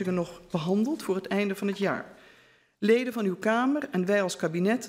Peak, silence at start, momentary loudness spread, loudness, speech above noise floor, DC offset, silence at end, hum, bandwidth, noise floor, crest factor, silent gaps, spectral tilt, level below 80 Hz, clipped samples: -10 dBFS; 0 s; 7 LU; -28 LUFS; 33 dB; under 0.1%; 0 s; none; 16 kHz; -60 dBFS; 18 dB; none; -6 dB/octave; -68 dBFS; under 0.1%